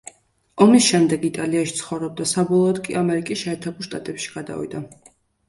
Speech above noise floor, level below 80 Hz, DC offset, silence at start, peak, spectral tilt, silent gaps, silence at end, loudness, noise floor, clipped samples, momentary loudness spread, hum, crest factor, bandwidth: 33 dB; -60 dBFS; under 0.1%; 0.55 s; 0 dBFS; -4.5 dB/octave; none; 0.6 s; -20 LUFS; -53 dBFS; under 0.1%; 16 LU; none; 20 dB; 11.5 kHz